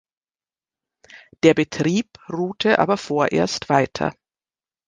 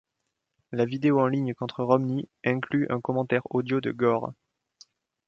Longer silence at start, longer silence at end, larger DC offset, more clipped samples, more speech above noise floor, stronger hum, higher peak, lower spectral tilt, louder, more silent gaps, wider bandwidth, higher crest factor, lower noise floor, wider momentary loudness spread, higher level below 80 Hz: first, 1.15 s vs 0.7 s; second, 0.75 s vs 0.95 s; neither; neither; first, over 70 dB vs 56 dB; neither; first, -2 dBFS vs -6 dBFS; second, -5.5 dB/octave vs -8.5 dB/octave; first, -20 LUFS vs -26 LUFS; neither; first, 9.8 kHz vs 7 kHz; about the same, 20 dB vs 22 dB; first, under -90 dBFS vs -81 dBFS; first, 10 LU vs 7 LU; first, -56 dBFS vs -68 dBFS